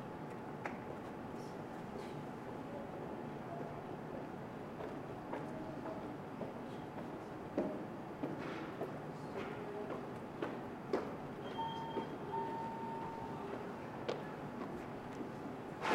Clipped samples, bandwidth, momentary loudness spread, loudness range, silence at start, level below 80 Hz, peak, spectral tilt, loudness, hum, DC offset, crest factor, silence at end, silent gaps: under 0.1%; 16 kHz; 5 LU; 3 LU; 0 s; -70 dBFS; -24 dBFS; -6.5 dB/octave; -45 LUFS; none; under 0.1%; 22 dB; 0 s; none